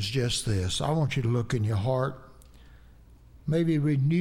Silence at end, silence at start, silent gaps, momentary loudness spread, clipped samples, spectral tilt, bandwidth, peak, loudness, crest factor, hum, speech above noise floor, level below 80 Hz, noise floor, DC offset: 0 s; 0 s; none; 5 LU; under 0.1%; -6 dB/octave; 15 kHz; -14 dBFS; -27 LUFS; 14 dB; none; 27 dB; -48 dBFS; -53 dBFS; under 0.1%